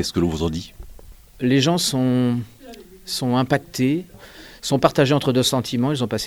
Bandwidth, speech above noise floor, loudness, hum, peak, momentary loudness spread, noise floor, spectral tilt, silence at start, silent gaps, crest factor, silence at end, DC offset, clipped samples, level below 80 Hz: over 20 kHz; 22 dB; -20 LUFS; none; 0 dBFS; 19 LU; -42 dBFS; -5 dB/octave; 0 s; none; 20 dB; 0 s; under 0.1%; under 0.1%; -46 dBFS